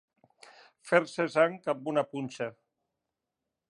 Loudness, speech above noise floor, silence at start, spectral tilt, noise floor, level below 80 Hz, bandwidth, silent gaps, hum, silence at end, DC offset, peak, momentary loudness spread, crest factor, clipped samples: -30 LUFS; 58 dB; 0.85 s; -5.5 dB/octave; -87 dBFS; -84 dBFS; 11.5 kHz; none; none; 1.2 s; under 0.1%; -8 dBFS; 11 LU; 26 dB; under 0.1%